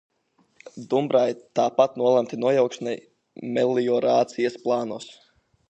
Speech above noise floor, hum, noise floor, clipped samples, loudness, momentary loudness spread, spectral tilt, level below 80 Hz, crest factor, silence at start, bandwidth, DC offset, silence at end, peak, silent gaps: 43 dB; none; -66 dBFS; under 0.1%; -23 LUFS; 14 LU; -6 dB/octave; -76 dBFS; 20 dB; 0.75 s; 8.6 kHz; under 0.1%; 0.6 s; -4 dBFS; none